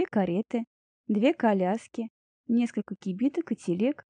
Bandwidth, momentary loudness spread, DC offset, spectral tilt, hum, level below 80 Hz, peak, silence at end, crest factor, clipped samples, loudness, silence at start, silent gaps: 10 kHz; 14 LU; under 0.1%; -7.5 dB/octave; none; -74 dBFS; -12 dBFS; 0.15 s; 16 dB; under 0.1%; -28 LUFS; 0 s; 0.67-1.04 s, 2.10-2.44 s